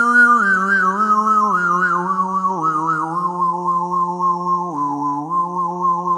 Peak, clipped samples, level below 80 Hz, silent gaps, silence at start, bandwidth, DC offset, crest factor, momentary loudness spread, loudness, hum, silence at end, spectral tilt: -2 dBFS; under 0.1%; -76 dBFS; none; 0 s; 11 kHz; under 0.1%; 14 dB; 7 LU; -17 LUFS; none; 0 s; -6 dB/octave